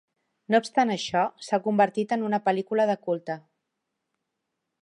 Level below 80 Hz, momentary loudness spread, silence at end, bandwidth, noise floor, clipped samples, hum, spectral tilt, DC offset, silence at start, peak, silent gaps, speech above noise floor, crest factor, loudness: -74 dBFS; 7 LU; 1.4 s; 11 kHz; -82 dBFS; under 0.1%; none; -5.5 dB/octave; under 0.1%; 0.5 s; -8 dBFS; none; 57 dB; 18 dB; -25 LUFS